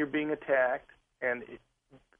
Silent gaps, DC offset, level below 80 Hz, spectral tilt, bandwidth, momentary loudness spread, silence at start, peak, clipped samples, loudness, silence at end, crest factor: none; under 0.1%; -70 dBFS; -7.5 dB/octave; 3.6 kHz; 17 LU; 0 s; -16 dBFS; under 0.1%; -31 LUFS; 0.25 s; 18 dB